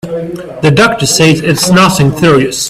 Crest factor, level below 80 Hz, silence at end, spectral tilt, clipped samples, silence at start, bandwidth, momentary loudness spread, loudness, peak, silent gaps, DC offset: 8 dB; -38 dBFS; 0 s; -4.5 dB/octave; 0.2%; 0.05 s; 16 kHz; 11 LU; -8 LUFS; 0 dBFS; none; under 0.1%